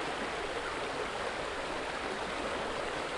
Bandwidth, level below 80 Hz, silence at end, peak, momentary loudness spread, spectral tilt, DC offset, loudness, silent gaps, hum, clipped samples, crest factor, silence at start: 11.5 kHz; -54 dBFS; 0 s; -22 dBFS; 1 LU; -3 dB/octave; under 0.1%; -36 LUFS; none; none; under 0.1%; 14 dB; 0 s